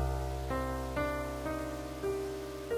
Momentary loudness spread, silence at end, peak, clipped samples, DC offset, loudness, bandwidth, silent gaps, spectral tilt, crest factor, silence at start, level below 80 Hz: 4 LU; 0 s; -22 dBFS; under 0.1%; under 0.1%; -37 LUFS; 16 kHz; none; -6 dB/octave; 14 dB; 0 s; -42 dBFS